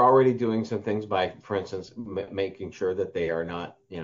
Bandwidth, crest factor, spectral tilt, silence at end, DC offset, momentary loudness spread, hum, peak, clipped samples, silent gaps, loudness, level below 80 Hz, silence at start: 7.4 kHz; 18 dB; -5.5 dB/octave; 0 s; under 0.1%; 13 LU; none; -8 dBFS; under 0.1%; none; -28 LUFS; -62 dBFS; 0 s